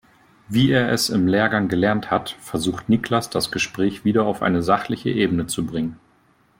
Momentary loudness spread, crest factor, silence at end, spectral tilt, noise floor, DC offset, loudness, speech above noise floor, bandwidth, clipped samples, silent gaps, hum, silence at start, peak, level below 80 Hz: 7 LU; 16 dB; 0.65 s; -5 dB/octave; -59 dBFS; under 0.1%; -21 LUFS; 38 dB; 16.5 kHz; under 0.1%; none; none; 0.5 s; -4 dBFS; -52 dBFS